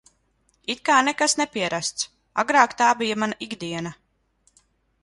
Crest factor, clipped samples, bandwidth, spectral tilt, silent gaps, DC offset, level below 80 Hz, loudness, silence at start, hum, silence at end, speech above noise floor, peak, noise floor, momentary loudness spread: 22 dB; under 0.1%; 11.5 kHz; -2.5 dB/octave; none; under 0.1%; -64 dBFS; -22 LUFS; 0.7 s; none; 1.1 s; 44 dB; -2 dBFS; -67 dBFS; 13 LU